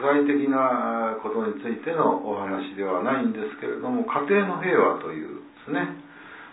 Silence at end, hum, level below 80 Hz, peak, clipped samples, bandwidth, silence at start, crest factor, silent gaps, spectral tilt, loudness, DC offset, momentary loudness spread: 0 s; none; -74 dBFS; -6 dBFS; under 0.1%; 4 kHz; 0 s; 18 dB; none; -10.5 dB/octave; -25 LUFS; under 0.1%; 12 LU